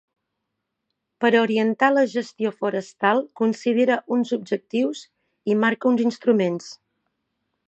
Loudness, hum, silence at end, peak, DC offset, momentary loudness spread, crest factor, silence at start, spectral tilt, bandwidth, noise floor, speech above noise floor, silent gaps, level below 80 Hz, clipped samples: -22 LUFS; none; 0.95 s; -4 dBFS; under 0.1%; 8 LU; 20 dB; 1.2 s; -5.5 dB/octave; 8.2 kHz; -80 dBFS; 58 dB; none; -78 dBFS; under 0.1%